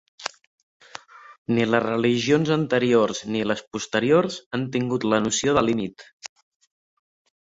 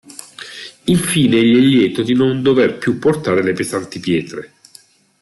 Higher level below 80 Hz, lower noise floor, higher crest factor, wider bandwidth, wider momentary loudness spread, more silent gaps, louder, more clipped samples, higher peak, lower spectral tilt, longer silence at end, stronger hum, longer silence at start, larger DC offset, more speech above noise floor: about the same, -58 dBFS vs -54 dBFS; about the same, -44 dBFS vs -47 dBFS; first, 20 dB vs 14 dB; second, 8 kHz vs 12.5 kHz; about the same, 21 LU vs 19 LU; first, 0.47-0.80 s, 1.38-1.45 s, 3.67-3.71 s, 4.46-4.51 s, 6.13-6.18 s vs none; second, -22 LUFS vs -15 LUFS; neither; about the same, -4 dBFS vs -2 dBFS; about the same, -5 dB/octave vs -5.5 dB/octave; first, 1.15 s vs 0.75 s; neither; about the same, 0.2 s vs 0.1 s; neither; second, 22 dB vs 33 dB